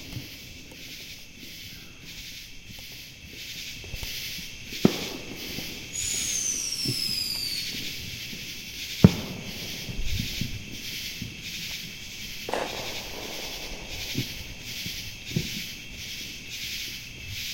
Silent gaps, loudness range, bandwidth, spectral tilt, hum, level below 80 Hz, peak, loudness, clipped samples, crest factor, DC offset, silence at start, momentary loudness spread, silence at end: none; 10 LU; 16.5 kHz; -3.5 dB/octave; none; -46 dBFS; 0 dBFS; -30 LUFS; under 0.1%; 32 dB; under 0.1%; 0 s; 15 LU; 0 s